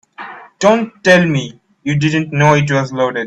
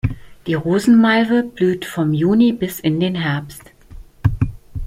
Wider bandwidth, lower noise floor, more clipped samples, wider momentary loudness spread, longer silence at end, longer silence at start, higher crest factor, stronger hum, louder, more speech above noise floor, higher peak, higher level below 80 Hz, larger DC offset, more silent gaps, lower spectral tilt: second, 9 kHz vs 16 kHz; second, -33 dBFS vs -39 dBFS; neither; first, 19 LU vs 12 LU; about the same, 0 s vs 0 s; first, 0.2 s vs 0.05 s; about the same, 14 dB vs 14 dB; neither; first, -13 LUFS vs -17 LUFS; about the same, 20 dB vs 23 dB; first, 0 dBFS vs -4 dBFS; second, -52 dBFS vs -36 dBFS; neither; neither; about the same, -6 dB/octave vs -7 dB/octave